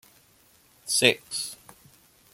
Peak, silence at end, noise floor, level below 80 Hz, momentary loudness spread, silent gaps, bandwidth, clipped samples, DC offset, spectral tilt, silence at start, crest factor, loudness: -4 dBFS; 0.8 s; -60 dBFS; -70 dBFS; 22 LU; none; 16.5 kHz; under 0.1%; under 0.1%; -1.5 dB/octave; 0.85 s; 26 dB; -24 LUFS